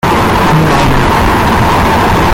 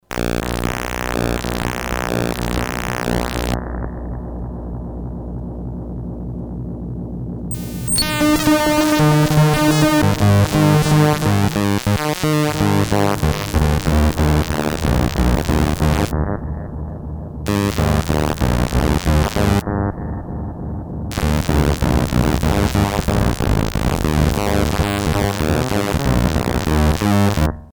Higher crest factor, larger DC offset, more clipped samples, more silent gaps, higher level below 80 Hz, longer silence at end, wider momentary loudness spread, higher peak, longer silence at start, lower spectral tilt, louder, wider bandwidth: second, 8 dB vs 16 dB; neither; neither; neither; first, -18 dBFS vs -26 dBFS; about the same, 0 s vs 0.05 s; second, 1 LU vs 14 LU; about the same, 0 dBFS vs -2 dBFS; about the same, 0.05 s vs 0.1 s; about the same, -5.5 dB/octave vs -5.5 dB/octave; first, -8 LUFS vs -18 LUFS; second, 17 kHz vs over 20 kHz